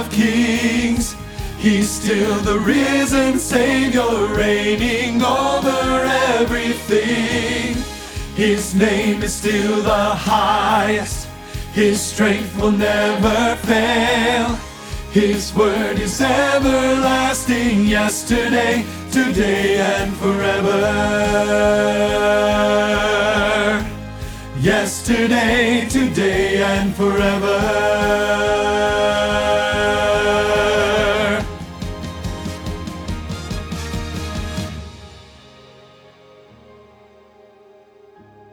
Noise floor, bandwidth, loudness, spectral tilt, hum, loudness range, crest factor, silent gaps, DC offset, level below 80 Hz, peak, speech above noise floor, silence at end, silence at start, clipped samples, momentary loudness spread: -48 dBFS; over 20 kHz; -17 LUFS; -4.5 dB/octave; none; 8 LU; 16 dB; none; under 0.1%; -34 dBFS; 0 dBFS; 31 dB; 3.25 s; 0 s; under 0.1%; 12 LU